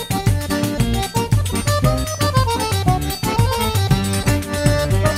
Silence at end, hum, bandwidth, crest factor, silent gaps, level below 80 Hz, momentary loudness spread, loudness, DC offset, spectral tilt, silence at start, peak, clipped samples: 0 s; none; 16.5 kHz; 16 dB; none; -28 dBFS; 3 LU; -18 LUFS; under 0.1%; -5 dB/octave; 0 s; 0 dBFS; under 0.1%